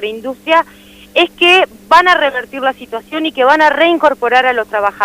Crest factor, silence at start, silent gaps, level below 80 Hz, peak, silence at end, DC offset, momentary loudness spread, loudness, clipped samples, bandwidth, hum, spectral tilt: 12 dB; 0 s; none; -52 dBFS; 0 dBFS; 0 s; under 0.1%; 12 LU; -11 LUFS; 0.1%; 16 kHz; 50 Hz at -45 dBFS; -2.5 dB/octave